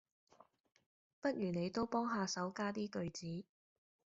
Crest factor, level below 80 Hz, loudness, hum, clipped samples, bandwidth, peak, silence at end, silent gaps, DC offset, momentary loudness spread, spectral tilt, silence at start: 18 dB; -74 dBFS; -41 LUFS; none; under 0.1%; 8 kHz; -24 dBFS; 0.75 s; none; under 0.1%; 8 LU; -5 dB/octave; 1.25 s